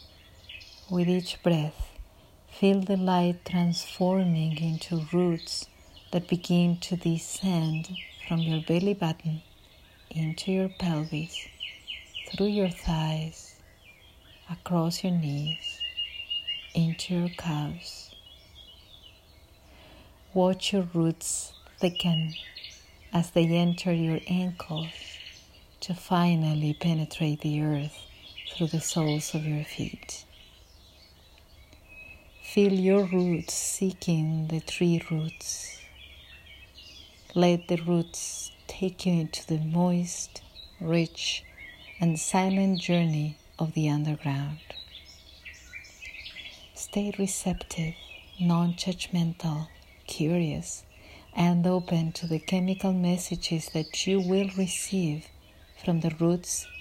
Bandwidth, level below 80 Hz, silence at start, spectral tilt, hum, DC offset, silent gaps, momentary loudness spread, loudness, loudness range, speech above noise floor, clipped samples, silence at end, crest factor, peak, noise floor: 15 kHz; -54 dBFS; 0 s; -5.5 dB/octave; none; under 0.1%; none; 18 LU; -28 LUFS; 5 LU; 28 dB; under 0.1%; 0 s; 20 dB; -10 dBFS; -55 dBFS